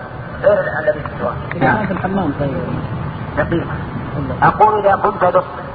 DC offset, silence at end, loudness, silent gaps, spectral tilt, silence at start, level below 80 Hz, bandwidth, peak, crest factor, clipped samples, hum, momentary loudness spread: under 0.1%; 0 s; -17 LUFS; none; -10 dB/octave; 0 s; -36 dBFS; 4.9 kHz; 0 dBFS; 16 dB; under 0.1%; none; 11 LU